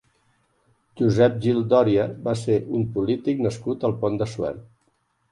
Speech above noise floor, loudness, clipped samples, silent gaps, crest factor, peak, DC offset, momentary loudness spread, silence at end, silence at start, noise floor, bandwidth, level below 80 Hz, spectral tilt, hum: 47 dB; -23 LUFS; under 0.1%; none; 18 dB; -6 dBFS; under 0.1%; 8 LU; 0.7 s; 0.95 s; -68 dBFS; 11.5 kHz; -54 dBFS; -7.5 dB/octave; none